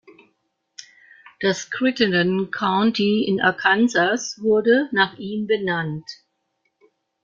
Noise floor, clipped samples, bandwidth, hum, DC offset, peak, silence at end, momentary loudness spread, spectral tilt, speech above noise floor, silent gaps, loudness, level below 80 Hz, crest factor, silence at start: -72 dBFS; under 0.1%; 7.6 kHz; none; under 0.1%; -4 dBFS; 1.1 s; 8 LU; -4.5 dB/octave; 52 dB; none; -20 LUFS; -64 dBFS; 18 dB; 0.8 s